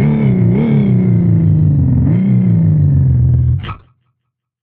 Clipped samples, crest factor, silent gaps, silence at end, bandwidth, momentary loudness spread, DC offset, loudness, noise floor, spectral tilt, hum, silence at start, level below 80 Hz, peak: under 0.1%; 8 dB; none; 0.85 s; 3.7 kHz; 2 LU; under 0.1%; -12 LUFS; -73 dBFS; -13 dB/octave; none; 0 s; -28 dBFS; -2 dBFS